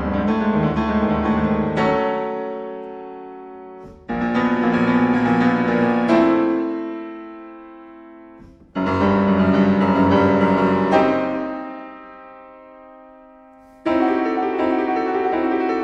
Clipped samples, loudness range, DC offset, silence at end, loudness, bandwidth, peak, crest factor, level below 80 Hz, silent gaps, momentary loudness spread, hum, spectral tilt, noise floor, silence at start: under 0.1%; 6 LU; under 0.1%; 0 s; -19 LUFS; 8 kHz; -2 dBFS; 18 dB; -44 dBFS; none; 20 LU; none; -8 dB/octave; -46 dBFS; 0 s